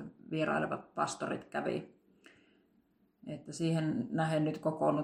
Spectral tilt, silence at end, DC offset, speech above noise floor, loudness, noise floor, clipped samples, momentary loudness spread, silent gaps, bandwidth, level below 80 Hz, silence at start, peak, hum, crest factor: -6 dB/octave; 0 s; under 0.1%; 38 dB; -35 LUFS; -72 dBFS; under 0.1%; 13 LU; none; 11.5 kHz; -74 dBFS; 0 s; -16 dBFS; none; 18 dB